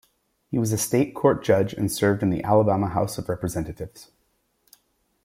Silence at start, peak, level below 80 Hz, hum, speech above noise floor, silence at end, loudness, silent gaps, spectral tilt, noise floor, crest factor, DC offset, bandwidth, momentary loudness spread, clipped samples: 0.5 s; -4 dBFS; -52 dBFS; none; 47 dB; 1.2 s; -23 LUFS; none; -6 dB/octave; -70 dBFS; 20 dB; under 0.1%; 16.5 kHz; 10 LU; under 0.1%